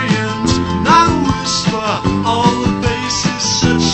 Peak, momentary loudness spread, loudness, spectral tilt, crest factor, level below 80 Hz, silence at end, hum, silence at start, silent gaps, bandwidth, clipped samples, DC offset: 0 dBFS; 6 LU; -14 LUFS; -4 dB/octave; 14 dB; -32 dBFS; 0 s; none; 0 s; none; 9 kHz; under 0.1%; under 0.1%